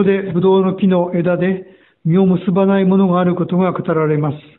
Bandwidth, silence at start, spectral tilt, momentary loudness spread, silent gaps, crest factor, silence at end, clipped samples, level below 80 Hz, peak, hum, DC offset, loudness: 4 kHz; 0 s; -13 dB/octave; 5 LU; none; 12 dB; 0.2 s; under 0.1%; -54 dBFS; -2 dBFS; none; under 0.1%; -15 LUFS